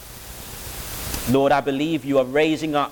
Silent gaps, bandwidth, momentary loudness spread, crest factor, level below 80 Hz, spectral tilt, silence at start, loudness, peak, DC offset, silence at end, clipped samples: none; 19.5 kHz; 16 LU; 16 dB; -42 dBFS; -5 dB/octave; 0 s; -21 LUFS; -6 dBFS; under 0.1%; 0 s; under 0.1%